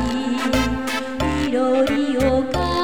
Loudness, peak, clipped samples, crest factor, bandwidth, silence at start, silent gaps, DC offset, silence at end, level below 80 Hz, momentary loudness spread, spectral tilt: -20 LUFS; -6 dBFS; under 0.1%; 14 dB; over 20 kHz; 0 s; none; 1%; 0 s; -34 dBFS; 5 LU; -5.5 dB/octave